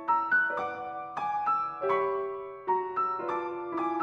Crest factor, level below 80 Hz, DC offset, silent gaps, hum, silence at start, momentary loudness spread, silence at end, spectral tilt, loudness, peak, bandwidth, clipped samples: 16 dB; -72 dBFS; under 0.1%; none; none; 0 s; 10 LU; 0 s; -6 dB/octave; -30 LUFS; -14 dBFS; 7.4 kHz; under 0.1%